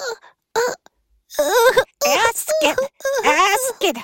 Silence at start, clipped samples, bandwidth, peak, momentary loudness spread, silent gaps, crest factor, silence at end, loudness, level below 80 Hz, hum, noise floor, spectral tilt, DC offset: 0 s; under 0.1%; 17 kHz; -2 dBFS; 13 LU; none; 18 dB; 0 s; -17 LUFS; -54 dBFS; none; -57 dBFS; -0.5 dB/octave; under 0.1%